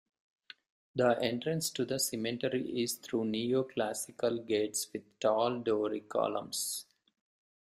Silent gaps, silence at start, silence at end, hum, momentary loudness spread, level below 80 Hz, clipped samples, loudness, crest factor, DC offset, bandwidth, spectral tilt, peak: none; 0.95 s; 0.8 s; none; 5 LU; -74 dBFS; under 0.1%; -33 LUFS; 20 dB; under 0.1%; 15.5 kHz; -4 dB/octave; -14 dBFS